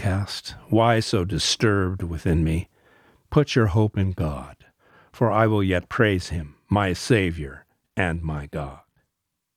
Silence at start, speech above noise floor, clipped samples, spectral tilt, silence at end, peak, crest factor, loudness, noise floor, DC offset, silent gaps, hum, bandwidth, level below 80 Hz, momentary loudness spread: 0 s; 58 dB; under 0.1%; -5.5 dB/octave; 0.8 s; -4 dBFS; 20 dB; -23 LUFS; -80 dBFS; under 0.1%; none; none; 14.5 kHz; -40 dBFS; 13 LU